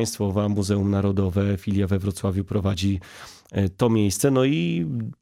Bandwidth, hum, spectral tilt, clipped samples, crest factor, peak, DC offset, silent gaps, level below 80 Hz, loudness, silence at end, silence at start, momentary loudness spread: 15.5 kHz; none; -6.5 dB/octave; under 0.1%; 16 dB; -8 dBFS; under 0.1%; none; -48 dBFS; -23 LUFS; 0.1 s; 0 s; 7 LU